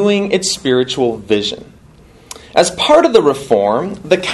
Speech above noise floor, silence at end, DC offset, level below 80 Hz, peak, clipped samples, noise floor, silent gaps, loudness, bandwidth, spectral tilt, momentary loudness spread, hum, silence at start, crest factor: 29 dB; 0 s; under 0.1%; -46 dBFS; 0 dBFS; 0.1%; -43 dBFS; none; -14 LUFS; 12.5 kHz; -4 dB/octave; 10 LU; none; 0 s; 14 dB